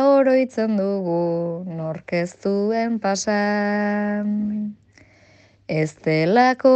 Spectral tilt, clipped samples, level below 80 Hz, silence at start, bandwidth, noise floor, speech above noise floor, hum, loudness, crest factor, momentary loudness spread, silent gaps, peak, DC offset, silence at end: -6 dB/octave; under 0.1%; -64 dBFS; 0 s; 8.6 kHz; -53 dBFS; 33 dB; none; -21 LUFS; 16 dB; 11 LU; none; -4 dBFS; under 0.1%; 0 s